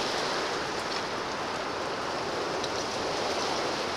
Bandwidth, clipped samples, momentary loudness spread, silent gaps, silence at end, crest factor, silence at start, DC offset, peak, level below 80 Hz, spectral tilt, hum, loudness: 16.5 kHz; under 0.1%; 3 LU; none; 0 s; 14 dB; 0 s; under 0.1%; -16 dBFS; -58 dBFS; -2.5 dB/octave; none; -30 LUFS